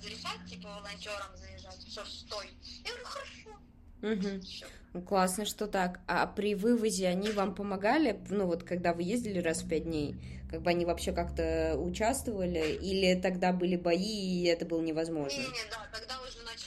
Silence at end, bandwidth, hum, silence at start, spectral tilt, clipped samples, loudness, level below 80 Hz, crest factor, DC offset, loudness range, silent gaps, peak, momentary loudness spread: 0 s; 14 kHz; none; 0 s; -5 dB/octave; under 0.1%; -33 LUFS; -50 dBFS; 20 dB; under 0.1%; 10 LU; none; -12 dBFS; 14 LU